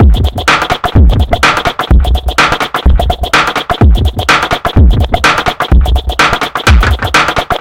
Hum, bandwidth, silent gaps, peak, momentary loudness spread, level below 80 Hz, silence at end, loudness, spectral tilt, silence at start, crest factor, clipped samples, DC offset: none; 16.5 kHz; none; 0 dBFS; 3 LU; -12 dBFS; 0 s; -9 LUFS; -5 dB/octave; 0 s; 8 dB; 0.2%; under 0.1%